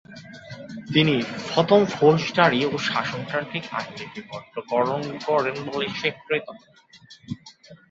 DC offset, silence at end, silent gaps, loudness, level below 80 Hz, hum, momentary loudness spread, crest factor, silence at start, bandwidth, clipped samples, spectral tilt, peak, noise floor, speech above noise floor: under 0.1%; 0.15 s; none; -23 LUFS; -62 dBFS; none; 19 LU; 22 dB; 0.1 s; 7.8 kHz; under 0.1%; -5.5 dB/octave; -2 dBFS; -48 dBFS; 25 dB